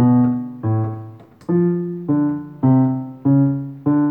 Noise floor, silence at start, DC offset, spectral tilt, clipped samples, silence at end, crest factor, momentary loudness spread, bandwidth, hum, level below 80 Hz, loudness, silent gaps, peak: -37 dBFS; 0 s; under 0.1%; -13 dB/octave; under 0.1%; 0 s; 12 dB; 9 LU; 2.5 kHz; none; -58 dBFS; -19 LUFS; none; -6 dBFS